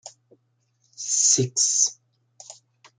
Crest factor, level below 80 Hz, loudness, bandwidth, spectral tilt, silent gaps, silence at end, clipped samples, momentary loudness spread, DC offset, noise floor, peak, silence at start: 22 dB; -74 dBFS; -19 LUFS; 11 kHz; -2 dB/octave; none; 0.5 s; under 0.1%; 7 LU; under 0.1%; -69 dBFS; -6 dBFS; 0.05 s